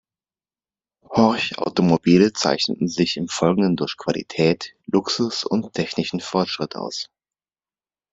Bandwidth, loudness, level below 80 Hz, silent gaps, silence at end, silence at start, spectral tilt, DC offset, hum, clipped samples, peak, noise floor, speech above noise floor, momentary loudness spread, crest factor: 8 kHz; -21 LUFS; -58 dBFS; none; 1.1 s; 1.1 s; -5 dB/octave; under 0.1%; none; under 0.1%; -2 dBFS; under -90 dBFS; over 70 dB; 10 LU; 20 dB